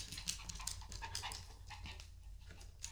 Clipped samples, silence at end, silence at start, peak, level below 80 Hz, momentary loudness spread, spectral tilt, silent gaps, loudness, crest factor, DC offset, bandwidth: under 0.1%; 0 s; 0 s; -18 dBFS; -54 dBFS; 14 LU; -1 dB/octave; none; -48 LUFS; 32 dB; under 0.1%; over 20 kHz